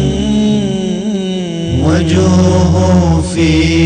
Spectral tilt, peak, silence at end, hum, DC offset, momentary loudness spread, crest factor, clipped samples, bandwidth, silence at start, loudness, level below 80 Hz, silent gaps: -6.5 dB/octave; -2 dBFS; 0 s; none; under 0.1%; 7 LU; 8 dB; under 0.1%; 9.8 kHz; 0 s; -12 LUFS; -26 dBFS; none